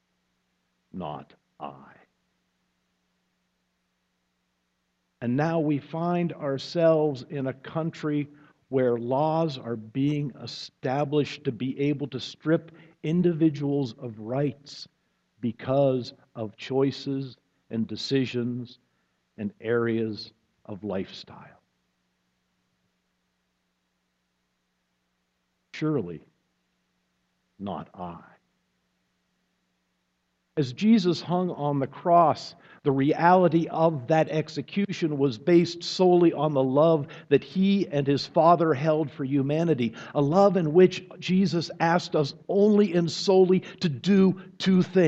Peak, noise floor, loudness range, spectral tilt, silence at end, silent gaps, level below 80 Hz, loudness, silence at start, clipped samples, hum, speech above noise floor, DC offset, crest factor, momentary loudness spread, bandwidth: -6 dBFS; -76 dBFS; 16 LU; -7 dB/octave; 0 s; none; -68 dBFS; -25 LUFS; 0.95 s; under 0.1%; none; 51 dB; under 0.1%; 22 dB; 17 LU; 8 kHz